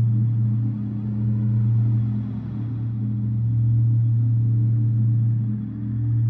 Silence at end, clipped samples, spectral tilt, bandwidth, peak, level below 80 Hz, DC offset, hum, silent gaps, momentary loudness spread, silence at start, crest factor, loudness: 0 s; under 0.1%; -13 dB/octave; 1.5 kHz; -12 dBFS; -46 dBFS; under 0.1%; none; none; 7 LU; 0 s; 8 dB; -22 LUFS